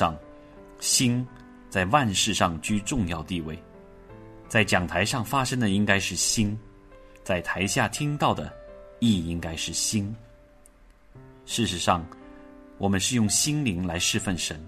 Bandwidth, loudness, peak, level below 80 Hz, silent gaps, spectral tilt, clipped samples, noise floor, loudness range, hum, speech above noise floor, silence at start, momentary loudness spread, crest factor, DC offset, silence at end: 13.5 kHz; -25 LUFS; -4 dBFS; -48 dBFS; none; -3.5 dB/octave; under 0.1%; -54 dBFS; 4 LU; none; 29 dB; 0 s; 11 LU; 22 dB; under 0.1%; 0 s